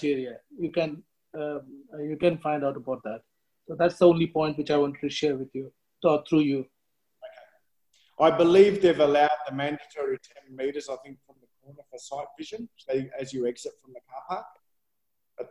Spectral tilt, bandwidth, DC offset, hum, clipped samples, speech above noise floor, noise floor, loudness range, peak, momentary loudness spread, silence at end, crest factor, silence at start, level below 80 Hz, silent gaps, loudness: -6.5 dB/octave; 11 kHz; under 0.1%; none; under 0.1%; 57 dB; -83 dBFS; 12 LU; -6 dBFS; 20 LU; 0.05 s; 22 dB; 0 s; -66 dBFS; none; -26 LUFS